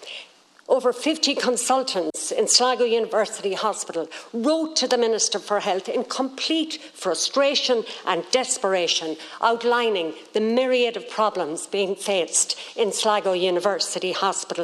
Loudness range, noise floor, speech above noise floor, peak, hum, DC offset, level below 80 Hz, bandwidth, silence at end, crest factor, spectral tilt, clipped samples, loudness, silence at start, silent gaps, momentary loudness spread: 2 LU; -47 dBFS; 24 dB; -4 dBFS; none; under 0.1%; -78 dBFS; 13.5 kHz; 0 s; 20 dB; -1.5 dB/octave; under 0.1%; -22 LUFS; 0 s; none; 7 LU